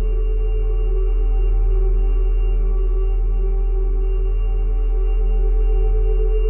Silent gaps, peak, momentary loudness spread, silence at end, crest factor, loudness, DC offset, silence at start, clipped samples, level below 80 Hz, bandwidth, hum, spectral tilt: none; -10 dBFS; 2 LU; 0 s; 6 dB; -22 LUFS; under 0.1%; 0 s; under 0.1%; -16 dBFS; 2.9 kHz; none; -12.5 dB/octave